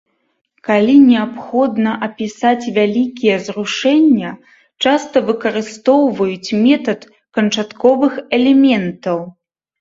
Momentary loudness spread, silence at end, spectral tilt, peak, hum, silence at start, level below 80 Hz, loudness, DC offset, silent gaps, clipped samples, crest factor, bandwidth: 11 LU; 0.5 s; -5.5 dB/octave; 0 dBFS; none; 0.65 s; -60 dBFS; -14 LUFS; under 0.1%; none; under 0.1%; 14 dB; 7.8 kHz